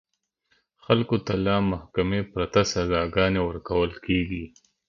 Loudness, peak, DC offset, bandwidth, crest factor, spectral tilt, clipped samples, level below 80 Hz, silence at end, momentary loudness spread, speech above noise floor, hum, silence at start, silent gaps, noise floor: -25 LUFS; -4 dBFS; under 0.1%; 7.4 kHz; 22 dB; -6 dB/octave; under 0.1%; -42 dBFS; 0.4 s; 5 LU; 47 dB; none; 0.9 s; none; -71 dBFS